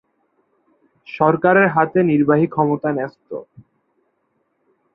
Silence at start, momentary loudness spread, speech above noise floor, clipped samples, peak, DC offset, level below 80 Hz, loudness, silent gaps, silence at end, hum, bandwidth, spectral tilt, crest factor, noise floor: 1.1 s; 19 LU; 51 dB; under 0.1%; -2 dBFS; under 0.1%; -62 dBFS; -17 LUFS; none; 1.5 s; none; 5.8 kHz; -11 dB/octave; 18 dB; -68 dBFS